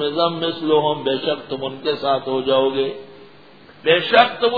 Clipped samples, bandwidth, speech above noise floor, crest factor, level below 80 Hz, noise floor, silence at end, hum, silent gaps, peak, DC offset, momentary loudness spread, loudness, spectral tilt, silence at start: under 0.1%; 5.4 kHz; 27 dB; 20 dB; -64 dBFS; -46 dBFS; 0 s; none; none; 0 dBFS; 0.3%; 11 LU; -19 LUFS; -7 dB/octave; 0 s